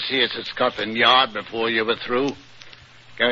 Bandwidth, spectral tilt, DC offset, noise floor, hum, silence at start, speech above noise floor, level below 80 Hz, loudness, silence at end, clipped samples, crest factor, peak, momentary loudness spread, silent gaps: 7.6 kHz; -4 dB/octave; under 0.1%; -46 dBFS; none; 0 s; 24 dB; -60 dBFS; -20 LUFS; 0 s; under 0.1%; 20 dB; -2 dBFS; 9 LU; none